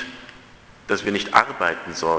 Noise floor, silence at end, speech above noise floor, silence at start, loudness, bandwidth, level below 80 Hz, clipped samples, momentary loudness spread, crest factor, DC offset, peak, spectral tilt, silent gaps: -47 dBFS; 0 s; 26 dB; 0 s; -21 LUFS; 8 kHz; -54 dBFS; under 0.1%; 20 LU; 24 dB; under 0.1%; 0 dBFS; -3.5 dB/octave; none